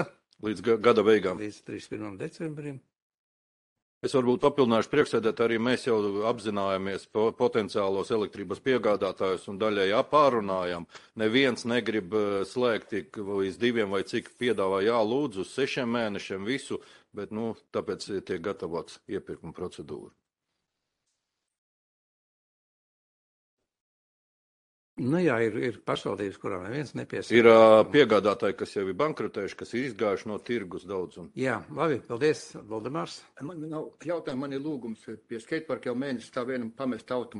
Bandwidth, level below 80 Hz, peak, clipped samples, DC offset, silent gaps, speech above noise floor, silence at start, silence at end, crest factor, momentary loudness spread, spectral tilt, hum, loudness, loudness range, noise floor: 11.5 kHz; -68 dBFS; -4 dBFS; under 0.1%; under 0.1%; 3.02-3.76 s, 3.82-4.01 s, 21.58-23.57 s, 23.80-24.96 s; 57 dB; 0 s; 0 s; 24 dB; 15 LU; -5.5 dB/octave; none; -28 LUFS; 13 LU; -84 dBFS